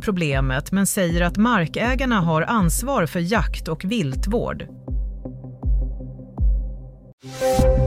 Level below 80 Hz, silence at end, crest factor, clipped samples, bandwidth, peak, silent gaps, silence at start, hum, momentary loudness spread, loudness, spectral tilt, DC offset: -26 dBFS; 0 s; 16 dB; under 0.1%; 16 kHz; -6 dBFS; 7.13-7.18 s; 0 s; none; 14 LU; -22 LUFS; -5.5 dB/octave; under 0.1%